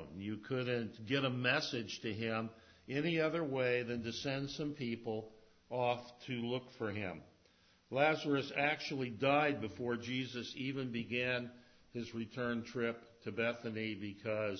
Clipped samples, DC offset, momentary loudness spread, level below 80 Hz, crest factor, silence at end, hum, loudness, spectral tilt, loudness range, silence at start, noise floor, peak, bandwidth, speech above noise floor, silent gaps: under 0.1%; under 0.1%; 11 LU; -70 dBFS; 20 dB; 0 s; none; -38 LUFS; -4 dB/octave; 5 LU; 0 s; -69 dBFS; -18 dBFS; 6.4 kHz; 31 dB; none